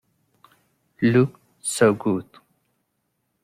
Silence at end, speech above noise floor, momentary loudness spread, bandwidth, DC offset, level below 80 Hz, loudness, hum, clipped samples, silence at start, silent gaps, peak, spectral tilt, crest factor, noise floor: 1.2 s; 54 dB; 10 LU; 15.5 kHz; under 0.1%; -62 dBFS; -22 LUFS; none; under 0.1%; 1 s; none; -4 dBFS; -5.5 dB/octave; 20 dB; -74 dBFS